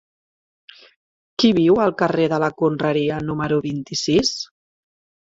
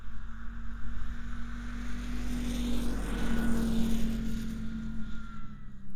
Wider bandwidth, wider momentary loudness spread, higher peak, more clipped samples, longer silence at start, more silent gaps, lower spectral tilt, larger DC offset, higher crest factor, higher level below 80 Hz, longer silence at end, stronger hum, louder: second, 7.8 kHz vs 15 kHz; second, 9 LU vs 15 LU; first, -4 dBFS vs -14 dBFS; neither; first, 1.4 s vs 0 s; neither; about the same, -5 dB/octave vs -6 dB/octave; neither; about the same, 18 dB vs 14 dB; second, -52 dBFS vs -38 dBFS; first, 0.8 s vs 0 s; neither; first, -19 LUFS vs -36 LUFS